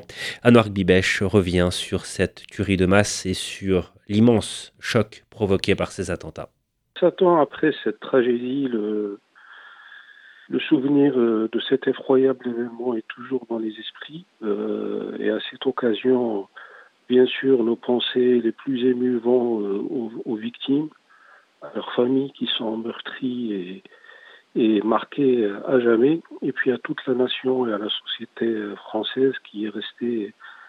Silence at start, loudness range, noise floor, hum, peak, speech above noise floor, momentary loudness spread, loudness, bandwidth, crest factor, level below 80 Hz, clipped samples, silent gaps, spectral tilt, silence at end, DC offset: 0 s; 5 LU; -53 dBFS; none; 0 dBFS; 31 dB; 12 LU; -22 LUFS; 13 kHz; 22 dB; -54 dBFS; under 0.1%; none; -5.5 dB/octave; 0.05 s; under 0.1%